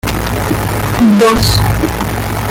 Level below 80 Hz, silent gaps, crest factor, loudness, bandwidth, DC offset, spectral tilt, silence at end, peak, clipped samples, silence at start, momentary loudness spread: -24 dBFS; none; 12 dB; -12 LUFS; 17 kHz; under 0.1%; -5 dB/octave; 0 s; 0 dBFS; under 0.1%; 0.05 s; 8 LU